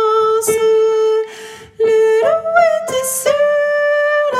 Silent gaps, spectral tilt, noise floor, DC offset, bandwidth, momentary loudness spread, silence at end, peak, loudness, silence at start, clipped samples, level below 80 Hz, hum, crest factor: none; -1.5 dB/octave; -34 dBFS; under 0.1%; 15.5 kHz; 6 LU; 0 s; 0 dBFS; -14 LUFS; 0 s; under 0.1%; -60 dBFS; none; 14 dB